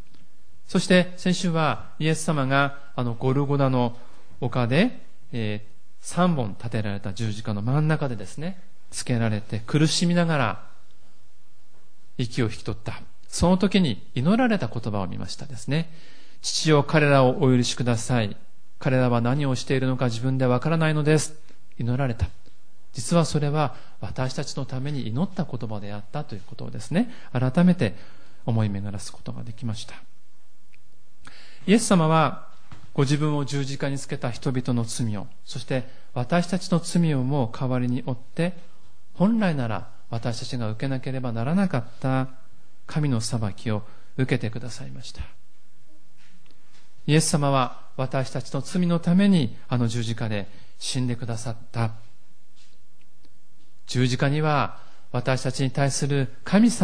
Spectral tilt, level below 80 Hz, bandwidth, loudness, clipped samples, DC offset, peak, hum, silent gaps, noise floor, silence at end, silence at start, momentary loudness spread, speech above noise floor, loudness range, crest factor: -6 dB/octave; -50 dBFS; 10.5 kHz; -25 LUFS; under 0.1%; 3%; -6 dBFS; none; none; -64 dBFS; 0 s; 0.7 s; 14 LU; 41 dB; 7 LU; 20 dB